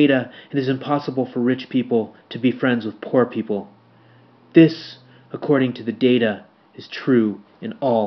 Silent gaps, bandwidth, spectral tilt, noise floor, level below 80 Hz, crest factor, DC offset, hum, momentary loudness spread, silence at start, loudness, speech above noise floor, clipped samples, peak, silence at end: none; 6 kHz; -5.5 dB/octave; -51 dBFS; -72 dBFS; 20 dB; under 0.1%; none; 15 LU; 0 s; -20 LUFS; 32 dB; under 0.1%; 0 dBFS; 0 s